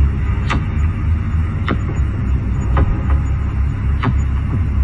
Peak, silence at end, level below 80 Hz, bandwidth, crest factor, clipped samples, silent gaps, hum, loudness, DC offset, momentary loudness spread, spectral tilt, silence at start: -4 dBFS; 0 s; -18 dBFS; 7.4 kHz; 12 dB; under 0.1%; none; none; -18 LUFS; under 0.1%; 3 LU; -8 dB/octave; 0 s